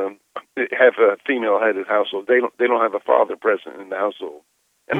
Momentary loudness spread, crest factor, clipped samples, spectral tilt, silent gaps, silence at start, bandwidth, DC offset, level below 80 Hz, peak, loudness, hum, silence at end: 14 LU; 18 dB; under 0.1%; -6.5 dB/octave; none; 0 s; 3.9 kHz; under 0.1%; -76 dBFS; -2 dBFS; -19 LUFS; none; 0 s